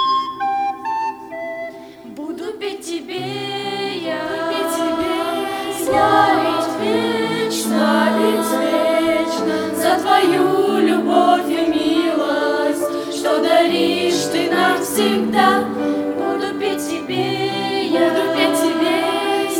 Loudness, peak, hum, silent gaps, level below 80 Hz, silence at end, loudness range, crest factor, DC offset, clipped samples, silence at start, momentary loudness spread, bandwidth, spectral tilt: -18 LUFS; -2 dBFS; none; none; -56 dBFS; 0 s; 8 LU; 16 dB; under 0.1%; under 0.1%; 0 s; 11 LU; 19.5 kHz; -4 dB/octave